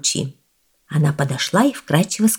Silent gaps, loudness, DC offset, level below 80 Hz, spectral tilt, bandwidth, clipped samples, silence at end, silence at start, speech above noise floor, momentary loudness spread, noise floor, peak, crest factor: none; -19 LUFS; under 0.1%; -60 dBFS; -4.5 dB/octave; 18.5 kHz; under 0.1%; 0 s; 0.05 s; 45 dB; 8 LU; -63 dBFS; -2 dBFS; 18 dB